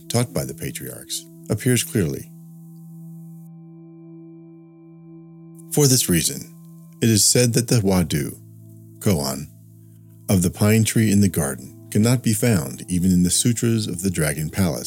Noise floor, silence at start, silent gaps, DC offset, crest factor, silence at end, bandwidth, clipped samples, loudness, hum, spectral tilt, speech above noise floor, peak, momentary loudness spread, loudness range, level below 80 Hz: -45 dBFS; 0.05 s; none; under 0.1%; 22 dB; 0 s; 17.5 kHz; under 0.1%; -20 LUFS; none; -4.5 dB/octave; 26 dB; 0 dBFS; 22 LU; 8 LU; -48 dBFS